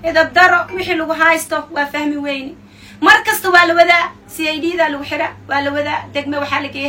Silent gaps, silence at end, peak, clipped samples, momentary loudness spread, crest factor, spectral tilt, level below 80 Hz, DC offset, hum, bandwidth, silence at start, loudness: none; 0 s; 0 dBFS; 0.3%; 11 LU; 16 dB; -3 dB/octave; -50 dBFS; under 0.1%; none; 17.5 kHz; 0 s; -14 LUFS